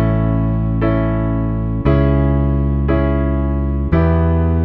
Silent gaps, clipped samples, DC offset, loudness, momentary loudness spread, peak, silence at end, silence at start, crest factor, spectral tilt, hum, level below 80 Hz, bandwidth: none; under 0.1%; under 0.1%; -16 LUFS; 4 LU; -2 dBFS; 0 s; 0 s; 14 dB; -12 dB/octave; none; -20 dBFS; 4.3 kHz